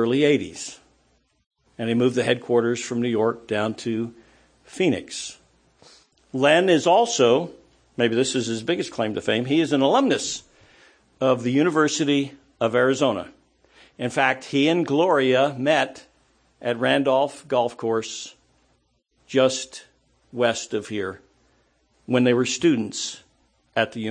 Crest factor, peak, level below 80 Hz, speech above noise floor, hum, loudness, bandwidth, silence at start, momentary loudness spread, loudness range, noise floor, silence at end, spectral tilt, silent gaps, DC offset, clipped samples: 20 dB; -4 dBFS; -66 dBFS; 45 dB; none; -22 LUFS; 9.8 kHz; 0 s; 14 LU; 5 LU; -67 dBFS; 0 s; -4.5 dB/octave; 1.46-1.51 s; under 0.1%; under 0.1%